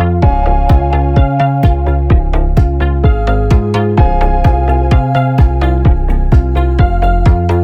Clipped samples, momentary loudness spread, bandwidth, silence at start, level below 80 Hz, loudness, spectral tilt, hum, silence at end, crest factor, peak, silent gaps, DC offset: under 0.1%; 2 LU; 6 kHz; 0 s; -12 dBFS; -12 LUFS; -9 dB/octave; none; 0 s; 10 dB; 0 dBFS; none; under 0.1%